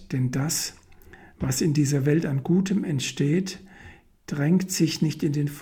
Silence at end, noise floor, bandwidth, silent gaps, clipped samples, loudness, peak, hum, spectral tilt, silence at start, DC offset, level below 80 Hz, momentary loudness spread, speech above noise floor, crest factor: 0 s; -49 dBFS; 18 kHz; none; under 0.1%; -25 LUFS; -10 dBFS; none; -5.5 dB/octave; 0 s; under 0.1%; -54 dBFS; 8 LU; 25 dB; 16 dB